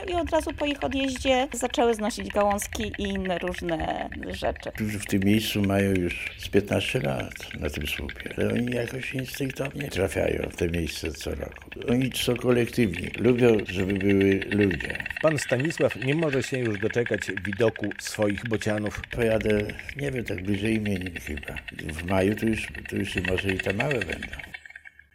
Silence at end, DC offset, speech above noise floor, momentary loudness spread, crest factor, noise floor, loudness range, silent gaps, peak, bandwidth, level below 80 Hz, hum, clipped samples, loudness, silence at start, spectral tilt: 0.25 s; under 0.1%; 21 dB; 9 LU; 20 dB; -48 dBFS; 5 LU; none; -6 dBFS; 16 kHz; -46 dBFS; none; under 0.1%; -27 LUFS; 0 s; -5.5 dB/octave